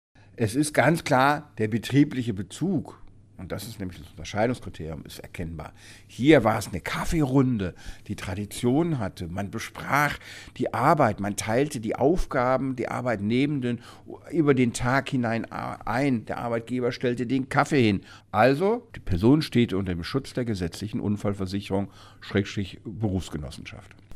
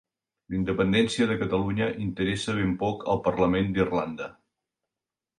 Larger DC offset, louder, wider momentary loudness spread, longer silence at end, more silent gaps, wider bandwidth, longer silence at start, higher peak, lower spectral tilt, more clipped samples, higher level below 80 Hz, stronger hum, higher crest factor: neither; about the same, -26 LUFS vs -26 LUFS; first, 15 LU vs 8 LU; second, 0 s vs 1.1 s; neither; first, 15.5 kHz vs 11 kHz; second, 0.35 s vs 0.5 s; first, -4 dBFS vs -10 dBFS; about the same, -6 dB/octave vs -6 dB/octave; neither; first, -44 dBFS vs -50 dBFS; neither; about the same, 22 dB vs 18 dB